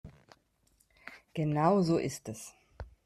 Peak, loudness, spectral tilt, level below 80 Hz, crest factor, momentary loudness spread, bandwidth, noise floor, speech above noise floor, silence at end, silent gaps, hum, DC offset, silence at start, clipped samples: -14 dBFS; -30 LUFS; -6.5 dB/octave; -58 dBFS; 20 dB; 24 LU; 14 kHz; -71 dBFS; 41 dB; 0.2 s; none; none; under 0.1%; 0.05 s; under 0.1%